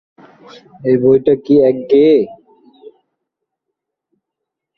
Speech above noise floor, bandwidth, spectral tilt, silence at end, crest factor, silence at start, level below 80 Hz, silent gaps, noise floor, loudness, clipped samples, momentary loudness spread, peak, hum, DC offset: 68 dB; 5.6 kHz; -9.5 dB/octave; 2.45 s; 14 dB; 0.85 s; -56 dBFS; none; -80 dBFS; -12 LUFS; under 0.1%; 8 LU; -2 dBFS; none; under 0.1%